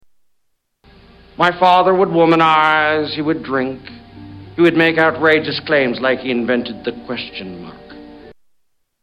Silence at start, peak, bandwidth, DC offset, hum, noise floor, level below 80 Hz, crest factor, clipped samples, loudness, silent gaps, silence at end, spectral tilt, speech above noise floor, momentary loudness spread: 1.4 s; -2 dBFS; 8.6 kHz; under 0.1%; none; -67 dBFS; -52 dBFS; 16 dB; under 0.1%; -15 LUFS; none; 0.7 s; -6.5 dB/octave; 52 dB; 18 LU